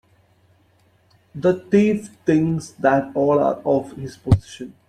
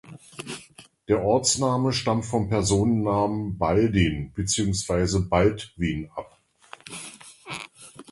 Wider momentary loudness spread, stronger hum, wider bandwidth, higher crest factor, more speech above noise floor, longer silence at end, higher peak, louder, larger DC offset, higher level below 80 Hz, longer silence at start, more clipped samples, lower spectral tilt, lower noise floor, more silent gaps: second, 11 LU vs 18 LU; neither; about the same, 11.5 kHz vs 11.5 kHz; about the same, 18 dB vs 18 dB; first, 39 dB vs 28 dB; about the same, 0.2 s vs 0.1 s; first, -2 dBFS vs -6 dBFS; first, -20 LUFS vs -24 LUFS; neither; about the same, -44 dBFS vs -42 dBFS; first, 1.35 s vs 0.05 s; neither; first, -8 dB/octave vs -5 dB/octave; first, -59 dBFS vs -51 dBFS; neither